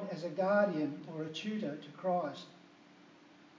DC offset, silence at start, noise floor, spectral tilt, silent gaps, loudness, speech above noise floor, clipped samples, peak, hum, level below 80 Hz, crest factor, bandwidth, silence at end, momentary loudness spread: under 0.1%; 0 s; -60 dBFS; -6.5 dB/octave; none; -36 LUFS; 25 dB; under 0.1%; -18 dBFS; none; under -90 dBFS; 18 dB; 7.6 kHz; 0.15 s; 12 LU